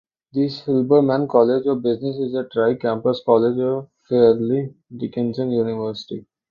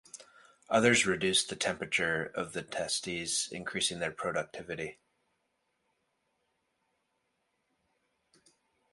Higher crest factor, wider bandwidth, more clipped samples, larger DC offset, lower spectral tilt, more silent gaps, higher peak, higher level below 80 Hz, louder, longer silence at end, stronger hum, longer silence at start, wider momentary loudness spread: second, 18 dB vs 24 dB; second, 6.8 kHz vs 11.5 kHz; neither; neither; first, -9 dB/octave vs -2.5 dB/octave; neither; first, -2 dBFS vs -10 dBFS; first, -60 dBFS vs -66 dBFS; first, -20 LUFS vs -31 LUFS; second, 0.3 s vs 4 s; neither; first, 0.35 s vs 0.15 s; about the same, 12 LU vs 14 LU